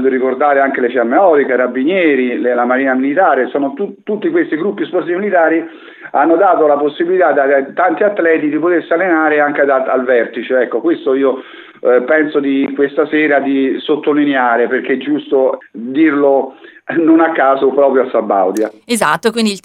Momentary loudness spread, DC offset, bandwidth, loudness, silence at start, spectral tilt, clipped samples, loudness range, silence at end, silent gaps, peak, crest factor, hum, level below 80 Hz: 7 LU; under 0.1%; 14 kHz; -13 LUFS; 0 s; -5 dB/octave; under 0.1%; 2 LU; 0.05 s; none; 0 dBFS; 12 dB; none; -70 dBFS